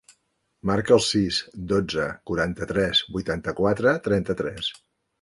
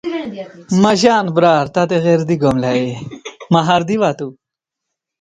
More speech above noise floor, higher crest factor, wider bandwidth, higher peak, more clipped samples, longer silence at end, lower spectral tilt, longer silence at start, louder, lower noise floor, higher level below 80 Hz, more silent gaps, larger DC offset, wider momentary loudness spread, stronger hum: second, 48 dB vs 66 dB; about the same, 20 dB vs 16 dB; first, 11.5 kHz vs 9.6 kHz; second, -4 dBFS vs 0 dBFS; neither; second, 0.5 s vs 0.9 s; second, -4.5 dB/octave vs -6 dB/octave; first, 0.65 s vs 0.05 s; second, -24 LUFS vs -15 LUFS; second, -71 dBFS vs -80 dBFS; about the same, -48 dBFS vs -52 dBFS; neither; neither; second, 9 LU vs 16 LU; neither